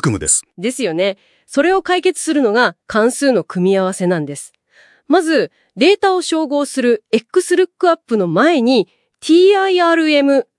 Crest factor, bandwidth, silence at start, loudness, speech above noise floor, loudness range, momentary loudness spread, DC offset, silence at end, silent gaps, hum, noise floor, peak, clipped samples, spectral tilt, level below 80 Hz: 14 dB; 12 kHz; 0.05 s; -15 LUFS; 37 dB; 3 LU; 8 LU; under 0.1%; 0.15 s; none; none; -51 dBFS; 0 dBFS; under 0.1%; -4 dB/octave; -54 dBFS